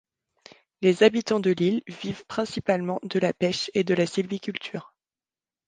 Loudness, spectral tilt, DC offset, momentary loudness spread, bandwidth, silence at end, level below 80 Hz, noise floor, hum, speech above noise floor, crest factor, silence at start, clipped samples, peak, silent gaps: -25 LUFS; -5.5 dB/octave; under 0.1%; 13 LU; 9.6 kHz; 0.85 s; -64 dBFS; under -90 dBFS; none; over 66 dB; 20 dB; 0.8 s; under 0.1%; -6 dBFS; none